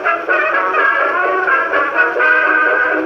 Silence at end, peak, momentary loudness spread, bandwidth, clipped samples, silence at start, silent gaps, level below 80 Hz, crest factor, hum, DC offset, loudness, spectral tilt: 0 s; -2 dBFS; 3 LU; 6.8 kHz; under 0.1%; 0 s; none; -64 dBFS; 12 dB; none; under 0.1%; -13 LUFS; -4 dB/octave